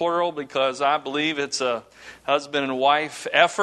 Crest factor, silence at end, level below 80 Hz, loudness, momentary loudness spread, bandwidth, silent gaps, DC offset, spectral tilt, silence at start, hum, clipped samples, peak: 22 dB; 0 s; -68 dBFS; -23 LUFS; 6 LU; 12.5 kHz; none; under 0.1%; -3 dB/octave; 0 s; none; under 0.1%; -2 dBFS